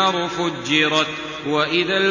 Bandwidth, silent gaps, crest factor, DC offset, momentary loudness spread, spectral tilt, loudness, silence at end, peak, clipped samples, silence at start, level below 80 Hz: 7.4 kHz; none; 18 dB; under 0.1%; 7 LU; -3.5 dB/octave; -19 LUFS; 0 s; -2 dBFS; under 0.1%; 0 s; -56 dBFS